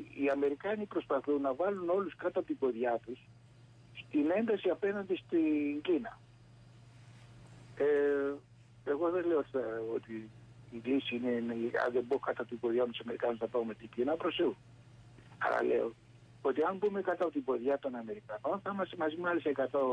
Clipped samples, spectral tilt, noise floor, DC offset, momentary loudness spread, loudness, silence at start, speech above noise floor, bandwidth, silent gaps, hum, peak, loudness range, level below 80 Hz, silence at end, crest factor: under 0.1%; -7 dB/octave; -59 dBFS; under 0.1%; 9 LU; -34 LUFS; 0 s; 25 dB; 9.2 kHz; none; none; -22 dBFS; 2 LU; -72 dBFS; 0 s; 14 dB